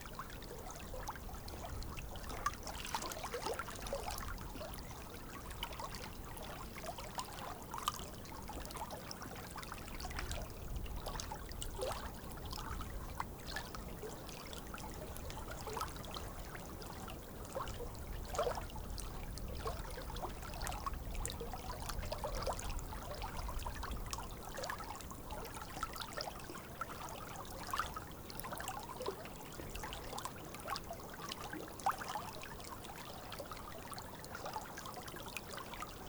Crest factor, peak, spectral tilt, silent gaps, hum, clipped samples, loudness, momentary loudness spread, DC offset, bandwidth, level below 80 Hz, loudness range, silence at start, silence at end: 26 dB; -18 dBFS; -3.5 dB/octave; none; none; under 0.1%; -45 LUFS; 6 LU; under 0.1%; over 20 kHz; -50 dBFS; 3 LU; 0 s; 0 s